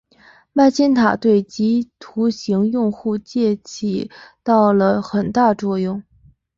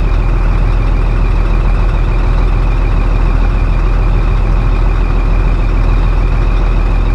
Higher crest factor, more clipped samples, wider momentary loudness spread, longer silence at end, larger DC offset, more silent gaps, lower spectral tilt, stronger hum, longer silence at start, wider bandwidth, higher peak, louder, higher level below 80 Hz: first, 16 dB vs 10 dB; neither; first, 10 LU vs 1 LU; first, 0.55 s vs 0 s; neither; neither; second, -6.5 dB/octave vs -8 dB/octave; neither; first, 0.55 s vs 0 s; first, 7.6 kHz vs 5.6 kHz; about the same, -2 dBFS vs 0 dBFS; second, -18 LUFS vs -14 LUFS; second, -56 dBFS vs -10 dBFS